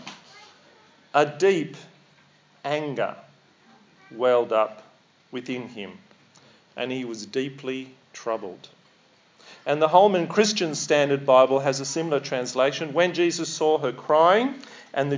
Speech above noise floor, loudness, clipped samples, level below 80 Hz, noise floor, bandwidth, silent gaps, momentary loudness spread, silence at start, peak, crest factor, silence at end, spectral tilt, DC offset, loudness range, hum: 36 dB; -23 LUFS; under 0.1%; -84 dBFS; -59 dBFS; 7.6 kHz; none; 19 LU; 0 s; -2 dBFS; 22 dB; 0 s; -4 dB/octave; under 0.1%; 12 LU; none